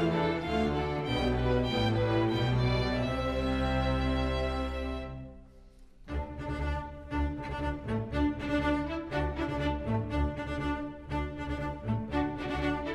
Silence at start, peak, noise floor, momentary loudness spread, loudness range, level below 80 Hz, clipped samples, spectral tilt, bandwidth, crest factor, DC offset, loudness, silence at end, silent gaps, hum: 0 s; -16 dBFS; -53 dBFS; 9 LU; 7 LU; -38 dBFS; under 0.1%; -7.5 dB/octave; 11 kHz; 14 dB; under 0.1%; -32 LUFS; 0 s; none; none